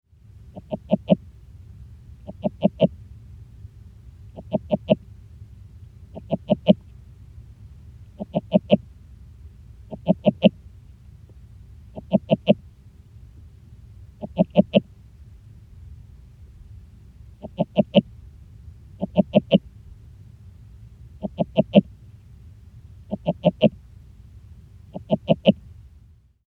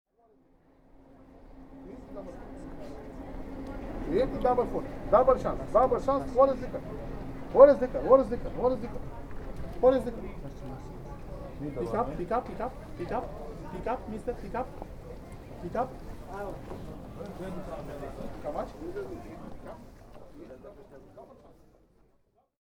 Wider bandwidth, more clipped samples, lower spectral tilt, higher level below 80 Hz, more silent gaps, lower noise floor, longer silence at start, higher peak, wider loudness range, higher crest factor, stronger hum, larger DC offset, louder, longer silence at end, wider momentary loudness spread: second, 4.4 kHz vs 11 kHz; neither; first, -9.5 dB/octave vs -8 dB/octave; about the same, -48 dBFS vs -44 dBFS; neither; second, -52 dBFS vs -68 dBFS; second, 0.55 s vs 1.2 s; first, 0 dBFS vs -4 dBFS; second, 4 LU vs 19 LU; about the same, 26 dB vs 26 dB; neither; neither; first, -23 LUFS vs -29 LUFS; second, 0.95 s vs 1.1 s; first, 26 LU vs 21 LU